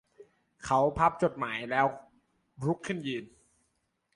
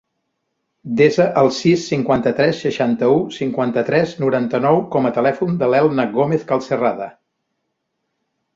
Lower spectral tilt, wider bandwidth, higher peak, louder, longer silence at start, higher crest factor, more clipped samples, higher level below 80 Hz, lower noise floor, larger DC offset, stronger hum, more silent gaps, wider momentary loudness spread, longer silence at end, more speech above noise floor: about the same, -6 dB/octave vs -6.5 dB/octave; first, 11.5 kHz vs 7.8 kHz; second, -12 dBFS vs -2 dBFS; second, -30 LUFS vs -17 LUFS; second, 0.2 s vs 0.85 s; about the same, 20 dB vs 16 dB; neither; about the same, -58 dBFS vs -58 dBFS; about the same, -77 dBFS vs -74 dBFS; neither; neither; neither; first, 12 LU vs 5 LU; second, 0.9 s vs 1.45 s; second, 48 dB vs 57 dB